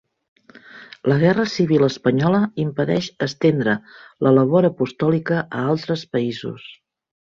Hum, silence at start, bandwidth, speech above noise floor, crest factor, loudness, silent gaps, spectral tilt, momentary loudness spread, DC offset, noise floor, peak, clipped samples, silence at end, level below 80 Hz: none; 0.75 s; 7.6 kHz; 25 dB; 16 dB; -19 LUFS; none; -7 dB/octave; 9 LU; under 0.1%; -44 dBFS; -4 dBFS; under 0.1%; 0.5 s; -58 dBFS